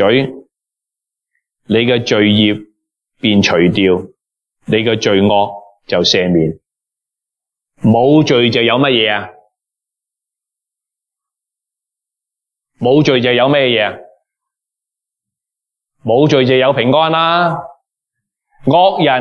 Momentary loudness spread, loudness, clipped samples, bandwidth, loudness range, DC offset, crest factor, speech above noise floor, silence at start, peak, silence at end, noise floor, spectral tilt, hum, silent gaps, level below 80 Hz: 9 LU; -12 LUFS; under 0.1%; 7.2 kHz; 3 LU; under 0.1%; 14 dB; 73 dB; 0 s; 0 dBFS; 0 s; -84 dBFS; -5.5 dB/octave; none; none; -54 dBFS